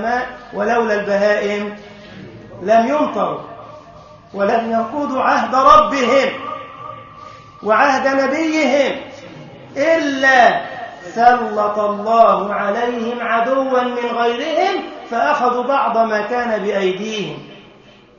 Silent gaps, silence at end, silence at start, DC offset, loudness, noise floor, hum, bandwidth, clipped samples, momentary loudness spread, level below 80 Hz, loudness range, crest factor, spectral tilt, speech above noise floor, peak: none; 0.55 s; 0 s; under 0.1%; -16 LUFS; -45 dBFS; none; 7.2 kHz; under 0.1%; 21 LU; -52 dBFS; 4 LU; 16 dB; -4.5 dB/octave; 29 dB; 0 dBFS